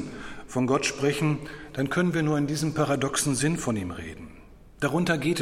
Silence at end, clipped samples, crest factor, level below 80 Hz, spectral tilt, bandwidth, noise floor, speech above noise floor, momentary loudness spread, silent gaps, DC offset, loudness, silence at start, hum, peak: 0 s; under 0.1%; 16 dB; -52 dBFS; -5 dB/octave; 16 kHz; -48 dBFS; 23 dB; 13 LU; none; under 0.1%; -26 LUFS; 0 s; none; -10 dBFS